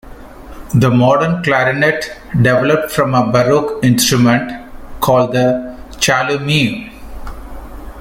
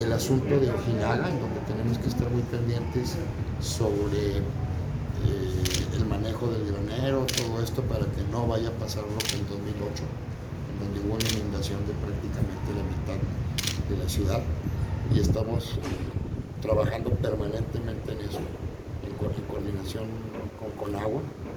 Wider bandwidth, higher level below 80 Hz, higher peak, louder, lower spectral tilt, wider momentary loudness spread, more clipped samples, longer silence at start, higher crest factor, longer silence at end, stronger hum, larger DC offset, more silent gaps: second, 17 kHz vs over 20 kHz; about the same, -36 dBFS vs -40 dBFS; first, 0 dBFS vs -10 dBFS; first, -13 LUFS vs -29 LUFS; about the same, -5 dB/octave vs -6 dB/octave; first, 21 LU vs 8 LU; neither; about the same, 0.05 s vs 0 s; about the same, 14 dB vs 18 dB; about the same, 0 s vs 0 s; neither; neither; neither